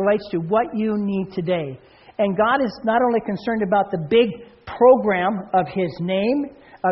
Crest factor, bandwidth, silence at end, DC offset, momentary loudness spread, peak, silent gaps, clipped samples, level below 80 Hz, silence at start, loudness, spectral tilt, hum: 18 dB; 5.8 kHz; 0 s; under 0.1%; 8 LU; -4 dBFS; none; under 0.1%; -56 dBFS; 0 s; -20 LUFS; -5 dB/octave; none